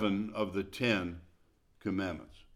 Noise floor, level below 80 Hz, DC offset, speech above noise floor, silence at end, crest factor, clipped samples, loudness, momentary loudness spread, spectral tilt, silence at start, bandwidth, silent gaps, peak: -67 dBFS; -60 dBFS; under 0.1%; 33 dB; 0.15 s; 20 dB; under 0.1%; -35 LUFS; 12 LU; -6 dB/octave; 0 s; 15.5 kHz; none; -16 dBFS